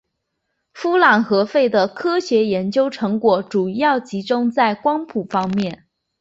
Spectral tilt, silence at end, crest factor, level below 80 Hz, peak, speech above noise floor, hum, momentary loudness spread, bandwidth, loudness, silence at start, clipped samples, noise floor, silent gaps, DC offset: -6 dB/octave; 0.45 s; 18 dB; -62 dBFS; 0 dBFS; 57 dB; none; 8 LU; 8 kHz; -18 LUFS; 0.75 s; under 0.1%; -75 dBFS; none; under 0.1%